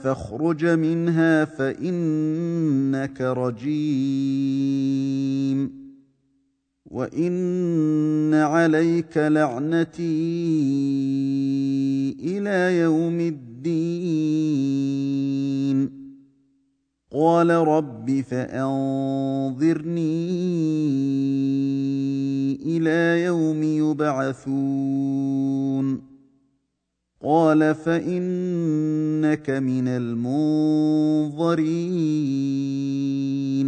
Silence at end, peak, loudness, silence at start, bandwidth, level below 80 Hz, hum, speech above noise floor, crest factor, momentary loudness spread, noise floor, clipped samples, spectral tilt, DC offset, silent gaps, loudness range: 0 s; -6 dBFS; -22 LUFS; 0 s; 9.2 kHz; -64 dBFS; none; 56 dB; 16 dB; 6 LU; -77 dBFS; under 0.1%; -8 dB/octave; under 0.1%; none; 3 LU